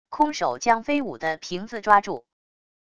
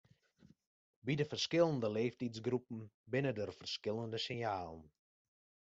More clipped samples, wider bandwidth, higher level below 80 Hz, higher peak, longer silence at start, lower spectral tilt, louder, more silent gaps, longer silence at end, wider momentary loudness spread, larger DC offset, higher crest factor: neither; first, 11 kHz vs 8 kHz; first, -60 dBFS vs -76 dBFS; first, -2 dBFS vs -18 dBFS; second, 0.1 s vs 1.05 s; about the same, -4 dB/octave vs -4.5 dB/octave; first, -23 LUFS vs -39 LUFS; second, none vs 2.94-3.04 s; about the same, 0.8 s vs 0.85 s; about the same, 12 LU vs 14 LU; neither; about the same, 22 dB vs 22 dB